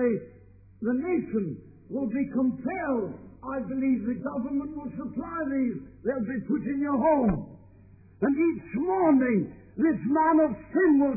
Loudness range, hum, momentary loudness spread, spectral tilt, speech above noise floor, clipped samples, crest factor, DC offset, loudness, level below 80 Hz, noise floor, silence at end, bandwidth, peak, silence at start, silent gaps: 5 LU; none; 13 LU; -14.5 dB/octave; 27 dB; under 0.1%; 14 dB; under 0.1%; -27 LUFS; -54 dBFS; -53 dBFS; 0 s; 2.6 kHz; -12 dBFS; 0 s; none